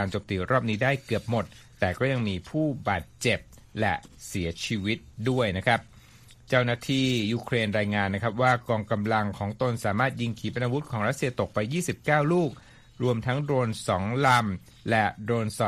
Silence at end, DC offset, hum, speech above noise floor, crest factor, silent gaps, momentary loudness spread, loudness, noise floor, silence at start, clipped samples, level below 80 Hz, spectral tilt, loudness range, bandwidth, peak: 0 s; under 0.1%; none; 26 dB; 20 dB; none; 7 LU; -27 LUFS; -52 dBFS; 0 s; under 0.1%; -54 dBFS; -5.5 dB/octave; 3 LU; 15 kHz; -6 dBFS